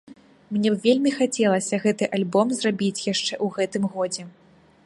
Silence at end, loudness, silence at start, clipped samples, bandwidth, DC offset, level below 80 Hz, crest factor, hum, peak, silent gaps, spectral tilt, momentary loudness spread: 0.55 s; -23 LUFS; 0.1 s; under 0.1%; 11.5 kHz; under 0.1%; -68 dBFS; 18 dB; none; -6 dBFS; none; -4.5 dB/octave; 6 LU